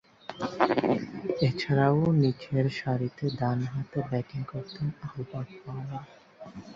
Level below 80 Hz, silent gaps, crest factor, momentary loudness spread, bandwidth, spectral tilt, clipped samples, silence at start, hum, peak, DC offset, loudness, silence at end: -60 dBFS; none; 22 dB; 15 LU; 7.4 kHz; -8 dB/octave; under 0.1%; 0.3 s; none; -6 dBFS; under 0.1%; -29 LUFS; 0 s